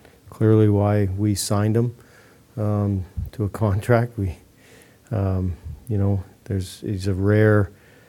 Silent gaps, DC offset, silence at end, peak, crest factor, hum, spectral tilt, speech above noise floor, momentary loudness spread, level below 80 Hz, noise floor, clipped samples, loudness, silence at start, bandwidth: none; under 0.1%; 0.4 s; -2 dBFS; 20 dB; none; -7 dB/octave; 31 dB; 12 LU; -44 dBFS; -51 dBFS; under 0.1%; -22 LUFS; 0.25 s; 14.5 kHz